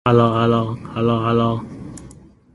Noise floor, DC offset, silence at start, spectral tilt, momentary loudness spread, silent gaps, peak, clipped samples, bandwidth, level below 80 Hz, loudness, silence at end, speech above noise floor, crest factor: -43 dBFS; under 0.1%; 0.05 s; -8 dB/octave; 20 LU; none; -2 dBFS; under 0.1%; 11.5 kHz; -46 dBFS; -18 LUFS; 0.4 s; 26 dB; 18 dB